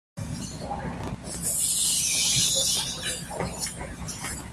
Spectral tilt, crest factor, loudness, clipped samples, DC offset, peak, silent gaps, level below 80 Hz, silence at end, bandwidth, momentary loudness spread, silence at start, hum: -1.5 dB/octave; 18 dB; -25 LUFS; under 0.1%; under 0.1%; -10 dBFS; none; -46 dBFS; 0 s; 15.5 kHz; 14 LU; 0.15 s; none